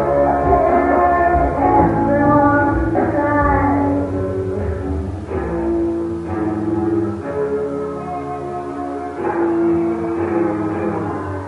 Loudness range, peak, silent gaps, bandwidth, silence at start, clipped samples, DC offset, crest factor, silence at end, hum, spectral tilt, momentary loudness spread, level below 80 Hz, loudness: 7 LU; -2 dBFS; none; 10.5 kHz; 0 s; under 0.1%; under 0.1%; 16 dB; 0 s; none; -9.5 dB/octave; 10 LU; -30 dBFS; -18 LUFS